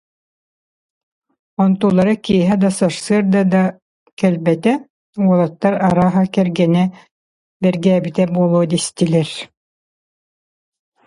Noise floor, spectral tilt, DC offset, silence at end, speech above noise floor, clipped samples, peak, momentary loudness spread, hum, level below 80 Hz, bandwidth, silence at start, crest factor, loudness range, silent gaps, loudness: under -90 dBFS; -6.5 dB/octave; under 0.1%; 1.6 s; over 75 dB; under 0.1%; -2 dBFS; 6 LU; none; -54 dBFS; 11.5 kHz; 1.6 s; 16 dB; 2 LU; 3.82-4.06 s, 4.12-4.17 s, 4.90-5.13 s, 7.11-7.60 s; -16 LUFS